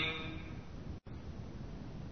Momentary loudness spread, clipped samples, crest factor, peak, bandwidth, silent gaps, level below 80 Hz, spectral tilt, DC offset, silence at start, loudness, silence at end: 7 LU; under 0.1%; 20 dB; -24 dBFS; 6.4 kHz; none; -52 dBFS; -3.5 dB/octave; 0.2%; 0 s; -45 LUFS; 0 s